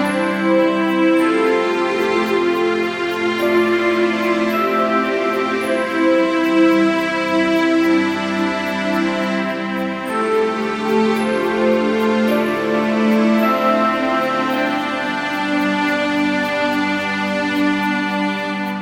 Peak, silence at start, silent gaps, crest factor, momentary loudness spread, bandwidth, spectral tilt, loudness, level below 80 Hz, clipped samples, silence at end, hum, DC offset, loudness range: -4 dBFS; 0 s; none; 14 dB; 5 LU; 16.5 kHz; -5.5 dB/octave; -17 LUFS; -58 dBFS; under 0.1%; 0 s; none; under 0.1%; 2 LU